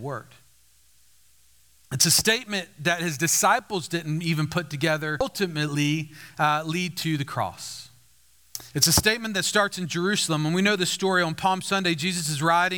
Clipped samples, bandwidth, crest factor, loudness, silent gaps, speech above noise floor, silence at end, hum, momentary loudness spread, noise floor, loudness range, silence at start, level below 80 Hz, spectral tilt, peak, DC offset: under 0.1%; over 20 kHz; 22 dB; -23 LUFS; none; 36 dB; 0 s; none; 12 LU; -61 dBFS; 4 LU; 0 s; -54 dBFS; -3 dB/octave; -4 dBFS; 0.1%